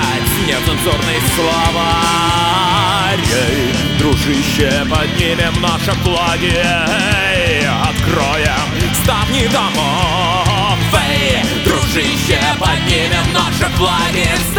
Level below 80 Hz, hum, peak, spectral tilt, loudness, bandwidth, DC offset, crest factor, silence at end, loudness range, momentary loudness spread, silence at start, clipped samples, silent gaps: -26 dBFS; none; 0 dBFS; -4 dB/octave; -13 LUFS; over 20 kHz; under 0.1%; 14 dB; 0 s; 1 LU; 2 LU; 0 s; under 0.1%; none